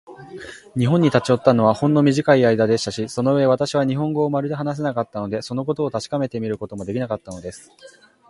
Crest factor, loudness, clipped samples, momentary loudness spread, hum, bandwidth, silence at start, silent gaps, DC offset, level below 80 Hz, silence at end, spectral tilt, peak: 20 dB; -20 LUFS; under 0.1%; 14 LU; none; 11.5 kHz; 0.1 s; none; under 0.1%; -56 dBFS; 0.4 s; -6.5 dB/octave; 0 dBFS